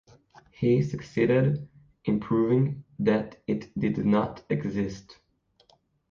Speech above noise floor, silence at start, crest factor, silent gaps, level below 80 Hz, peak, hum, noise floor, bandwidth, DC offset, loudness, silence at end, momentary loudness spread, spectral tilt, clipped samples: 39 dB; 0.6 s; 16 dB; none; -56 dBFS; -10 dBFS; none; -65 dBFS; 7.2 kHz; under 0.1%; -27 LUFS; 1 s; 9 LU; -8.5 dB/octave; under 0.1%